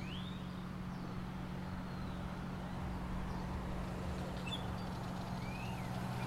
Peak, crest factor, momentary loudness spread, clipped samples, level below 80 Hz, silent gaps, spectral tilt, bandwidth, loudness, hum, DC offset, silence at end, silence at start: -28 dBFS; 12 dB; 3 LU; under 0.1%; -50 dBFS; none; -6.5 dB/octave; 16 kHz; -43 LUFS; none; under 0.1%; 0 s; 0 s